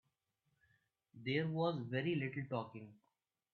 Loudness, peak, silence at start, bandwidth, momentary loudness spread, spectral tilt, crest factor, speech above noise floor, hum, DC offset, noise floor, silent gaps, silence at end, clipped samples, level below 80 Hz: -40 LUFS; -24 dBFS; 1.15 s; 4.7 kHz; 14 LU; -5.5 dB/octave; 18 dB; 45 dB; none; under 0.1%; -85 dBFS; none; 0.6 s; under 0.1%; -82 dBFS